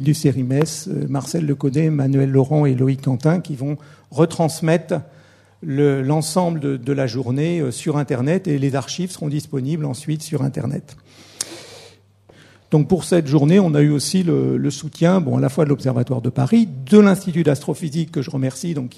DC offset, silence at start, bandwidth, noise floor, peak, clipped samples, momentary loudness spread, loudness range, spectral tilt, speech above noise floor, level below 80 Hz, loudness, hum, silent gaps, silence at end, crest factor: under 0.1%; 0 s; 13.5 kHz; -50 dBFS; 0 dBFS; under 0.1%; 10 LU; 7 LU; -7 dB/octave; 32 dB; -58 dBFS; -19 LUFS; none; none; 0.1 s; 18 dB